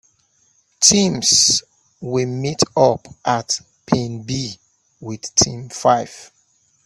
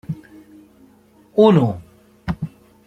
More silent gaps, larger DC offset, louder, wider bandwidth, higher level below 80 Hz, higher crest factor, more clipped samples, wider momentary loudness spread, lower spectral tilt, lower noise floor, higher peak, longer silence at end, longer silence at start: neither; neither; about the same, -17 LUFS vs -18 LUFS; first, 15 kHz vs 8.6 kHz; second, -52 dBFS vs -46 dBFS; about the same, 20 dB vs 18 dB; neither; second, 17 LU vs 20 LU; second, -3 dB/octave vs -9 dB/octave; first, -61 dBFS vs -52 dBFS; about the same, 0 dBFS vs -2 dBFS; first, 0.6 s vs 0.4 s; first, 0.8 s vs 0.1 s